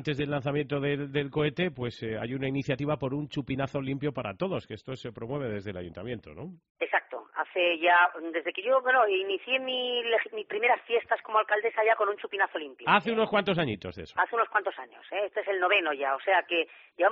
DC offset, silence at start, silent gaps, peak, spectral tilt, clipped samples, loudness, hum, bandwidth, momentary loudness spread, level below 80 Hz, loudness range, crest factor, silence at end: under 0.1%; 0 s; 6.70-6.75 s; -8 dBFS; -3 dB/octave; under 0.1%; -28 LUFS; none; 7.2 kHz; 13 LU; -64 dBFS; 8 LU; 20 dB; 0 s